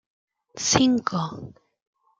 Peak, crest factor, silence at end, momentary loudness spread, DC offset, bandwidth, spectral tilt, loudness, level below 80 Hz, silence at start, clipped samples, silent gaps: -4 dBFS; 22 dB; 0.7 s; 14 LU; under 0.1%; 9.4 kHz; -3.5 dB/octave; -23 LUFS; -54 dBFS; 0.55 s; under 0.1%; none